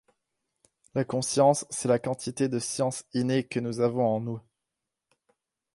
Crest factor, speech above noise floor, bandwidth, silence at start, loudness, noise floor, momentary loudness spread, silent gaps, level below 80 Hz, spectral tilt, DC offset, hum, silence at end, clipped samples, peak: 20 dB; 59 dB; 11.5 kHz; 0.95 s; -27 LUFS; -86 dBFS; 10 LU; none; -68 dBFS; -5 dB/octave; under 0.1%; none; 1.35 s; under 0.1%; -8 dBFS